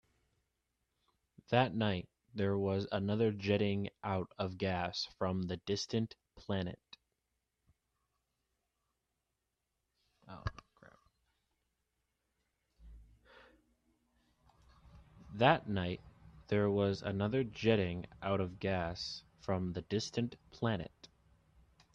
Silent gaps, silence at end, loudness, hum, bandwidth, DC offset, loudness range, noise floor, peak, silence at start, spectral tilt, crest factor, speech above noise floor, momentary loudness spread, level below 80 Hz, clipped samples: none; 0.9 s; -36 LUFS; none; 8.2 kHz; under 0.1%; 19 LU; -87 dBFS; -12 dBFS; 1.5 s; -6.5 dB/octave; 26 dB; 52 dB; 13 LU; -64 dBFS; under 0.1%